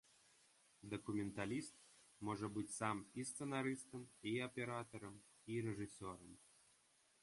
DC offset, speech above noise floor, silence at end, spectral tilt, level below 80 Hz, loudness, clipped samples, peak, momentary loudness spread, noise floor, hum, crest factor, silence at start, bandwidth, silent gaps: under 0.1%; 29 dB; 0.75 s; -5 dB/octave; -76 dBFS; -47 LUFS; under 0.1%; -26 dBFS; 15 LU; -76 dBFS; none; 24 dB; 0.8 s; 11.5 kHz; none